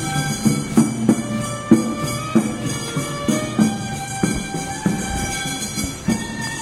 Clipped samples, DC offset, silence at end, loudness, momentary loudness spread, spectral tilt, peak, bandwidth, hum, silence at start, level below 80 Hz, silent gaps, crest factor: under 0.1%; under 0.1%; 0 s; -21 LUFS; 7 LU; -4.5 dB/octave; -2 dBFS; 16 kHz; none; 0 s; -40 dBFS; none; 20 dB